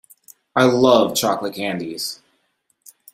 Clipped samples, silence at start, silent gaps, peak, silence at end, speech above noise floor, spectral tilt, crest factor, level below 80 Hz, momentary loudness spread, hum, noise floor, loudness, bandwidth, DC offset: under 0.1%; 0.55 s; none; -2 dBFS; 1 s; 50 dB; -4 dB/octave; 18 dB; -60 dBFS; 13 LU; none; -68 dBFS; -18 LUFS; 16 kHz; under 0.1%